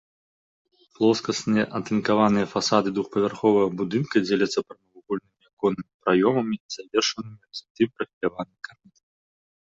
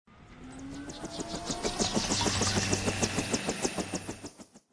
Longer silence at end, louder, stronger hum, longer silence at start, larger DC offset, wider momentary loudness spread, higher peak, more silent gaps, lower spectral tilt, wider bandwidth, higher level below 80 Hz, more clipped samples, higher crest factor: first, 1.2 s vs 0.15 s; first, -24 LUFS vs -31 LUFS; neither; first, 1 s vs 0.1 s; neither; about the same, 15 LU vs 17 LU; first, -4 dBFS vs -12 dBFS; first, 5.53-5.57 s, 5.94-6.00 s, 6.60-6.69 s, 7.70-7.75 s, 8.13-8.21 s vs none; first, -5 dB/octave vs -3 dB/octave; second, 7.8 kHz vs 11 kHz; second, -62 dBFS vs -50 dBFS; neither; about the same, 20 dB vs 20 dB